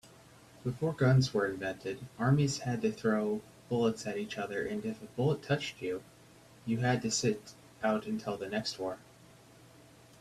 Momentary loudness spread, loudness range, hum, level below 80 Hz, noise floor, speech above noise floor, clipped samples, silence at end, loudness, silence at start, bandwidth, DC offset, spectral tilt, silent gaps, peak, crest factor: 12 LU; 4 LU; none; -66 dBFS; -58 dBFS; 26 dB; under 0.1%; 1.2 s; -33 LUFS; 0.05 s; 13.5 kHz; under 0.1%; -5.5 dB/octave; none; -16 dBFS; 18 dB